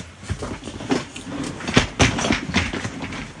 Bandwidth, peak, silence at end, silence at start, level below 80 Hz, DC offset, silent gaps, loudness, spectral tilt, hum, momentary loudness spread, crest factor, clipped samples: 11.5 kHz; 0 dBFS; 0 s; 0 s; -38 dBFS; under 0.1%; none; -23 LUFS; -4 dB/octave; none; 13 LU; 24 dB; under 0.1%